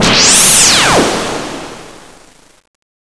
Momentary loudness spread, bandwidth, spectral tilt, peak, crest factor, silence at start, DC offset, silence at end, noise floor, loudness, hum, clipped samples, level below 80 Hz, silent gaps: 21 LU; 11 kHz; -1 dB/octave; 0 dBFS; 12 dB; 0 s; under 0.1%; 1.1 s; -42 dBFS; -6 LUFS; none; 0.3%; -36 dBFS; none